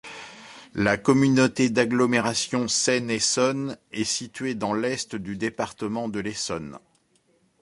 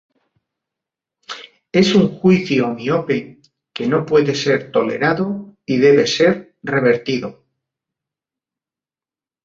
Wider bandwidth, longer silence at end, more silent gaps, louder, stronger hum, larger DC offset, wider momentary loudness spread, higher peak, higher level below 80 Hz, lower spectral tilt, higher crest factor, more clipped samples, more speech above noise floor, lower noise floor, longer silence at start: first, 11.5 kHz vs 7.8 kHz; second, 0.85 s vs 2.1 s; neither; second, -24 LUFS vs -17 LUFS; neither; neither; about the same, 13 LU vs 15 LU; second, -6 dBFS vs -2 dBFS; about the same, -58 dBFS vs -58 dBFS; second, -4 dB/octave vs -6 dB/octave; about the same, 20 dB vs 16 dB; neither; second, 41 dB vs over 74 dB; second, -65 dBFS vs under -90 dBFS; second, 0.05 s vs 1.3 s